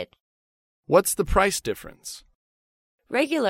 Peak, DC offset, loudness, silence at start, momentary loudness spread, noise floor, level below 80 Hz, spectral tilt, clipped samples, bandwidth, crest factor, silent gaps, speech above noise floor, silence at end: -4 dBFS; under 0.1%; -23 LUFS; 0 s; 18 LU; under -90 dBFS; -40 dBFS; -3.5 dB/octave; under 0.1%; 16.5 kHz; 22 dB; 0.20-0.83 s, 2.35-2.98 s; over 67 dB; 0 s